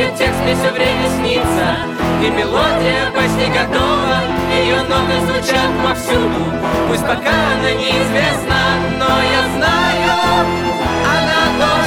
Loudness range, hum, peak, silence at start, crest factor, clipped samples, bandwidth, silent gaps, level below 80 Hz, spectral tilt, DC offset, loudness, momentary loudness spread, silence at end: 1 LU; none; 0 dBFS; 0 s; 14 dB; under 0.1%; 18 kHz; none; -32 dBFS; -4.5 dB/octave; under 0.1%; -14 LUFS; 3 LU; 0 s